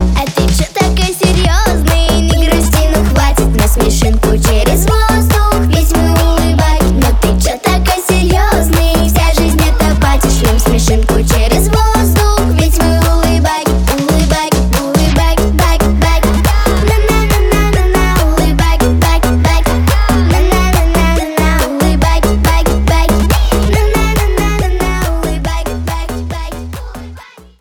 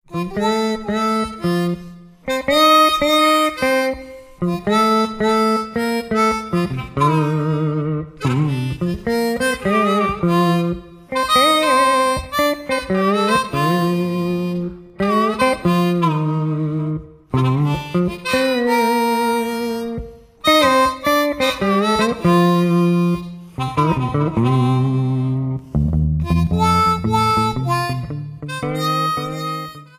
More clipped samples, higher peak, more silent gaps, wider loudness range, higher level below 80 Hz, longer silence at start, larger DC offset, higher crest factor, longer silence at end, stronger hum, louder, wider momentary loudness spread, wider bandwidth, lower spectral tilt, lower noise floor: neither; about the same, 0 dBFS vs 0 dBFS; neither; about the same, 1 LU vs 3 LU; first, -12 dBFS vs -38 dBFS; about the same, 0 s vs 0.1 s; neither; second, 10 dB vs 18 dB; first, 0.4 s vs 0.15 s; neither; first, -11 LUFS vs -18 LUFS; second, 3 LU vs 10 LU; first, 19 kHz vs 15.5 kHz; about the same, -5 dB/octave vs -6 dB/octave; second, -33 dBFS vs -37 dBFS